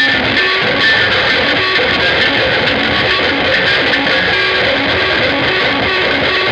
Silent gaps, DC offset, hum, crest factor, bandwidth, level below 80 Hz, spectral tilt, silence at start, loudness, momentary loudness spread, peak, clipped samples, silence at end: none; under 0.1%; none; 12 dB; 11 kHz; -38 dBFS; -4.5 dB/octave; 0 s; -11 LUFS; 2 LU; -2 dBFS; under 0.1%; 0 s